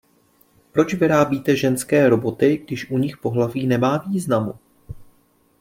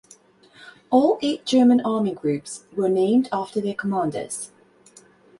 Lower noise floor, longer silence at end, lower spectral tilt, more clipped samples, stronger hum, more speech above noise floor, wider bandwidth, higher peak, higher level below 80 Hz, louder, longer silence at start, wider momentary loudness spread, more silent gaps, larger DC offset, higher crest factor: first, -59 dBFS vs -53 dBFS; second, 0.6 s vs 0.95 s; about the same, -6.5 dB/octave vs -5.5 dB/octave; neither; neither; first, 40 dB vs 32 dB; first, 16.5 kHz vs 11.5 kHz; about the same, -2 dBFS vs -4 dBFS; first, -54 dBFS vs -66 dBFS; about the same, -20 LUFS vs -22 LUFS; first, 0.75 s vs 0.6 s; second, 7 LU vs 13 LU; neither; neither; about the same, 18 dB vs 18 dB